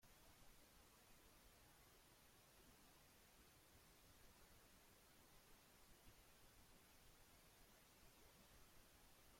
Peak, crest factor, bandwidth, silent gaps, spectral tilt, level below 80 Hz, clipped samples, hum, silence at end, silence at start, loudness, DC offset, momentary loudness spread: -54 dBFS; 16 dB; 16.5 kHz; none; -2.5 dB/octave; -78 dBFS; under 0.1%; none; 0 s; 0 s; -70 LUFS; under 0.1%; 1 LU